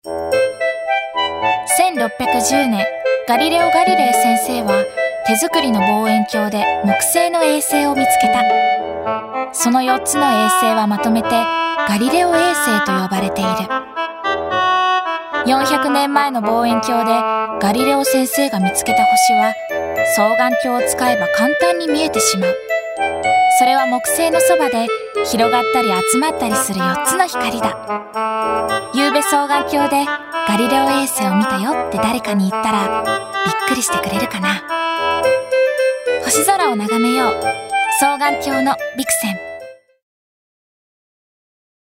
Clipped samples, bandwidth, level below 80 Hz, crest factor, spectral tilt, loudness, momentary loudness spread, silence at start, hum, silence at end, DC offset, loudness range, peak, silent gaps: under 0.1%; 16.5 kHz; -52 dBFS; 16 dB; -3 dB/octave; -15 LUFS; 6 LU; 0.05 s; none; 2.2 s; under 0.1%; 3 LU; 0 dBFS; none